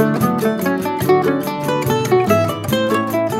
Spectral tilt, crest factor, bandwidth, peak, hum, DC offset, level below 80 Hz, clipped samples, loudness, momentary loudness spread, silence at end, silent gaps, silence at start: -6 dB/octave; 14 dB; 16 kHz; -2 dBFS; none; under 0.1%; -48 dBFS; under 0.1%; -17 LUFS; 4 LU; 0 s; none; 0 s